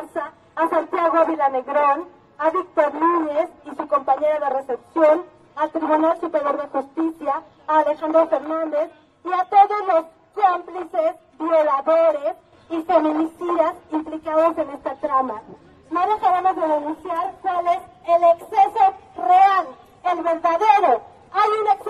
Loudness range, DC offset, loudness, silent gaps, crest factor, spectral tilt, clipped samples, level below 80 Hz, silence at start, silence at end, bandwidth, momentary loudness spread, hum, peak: 4 LU; under 0.1%; -20 LUFS; none; 18 dB; -5 dB/octave; under 0.1%; -64 dBFS; 0 s; 0 s; 11.5 kHz; 11 LU; none; -2 dBFS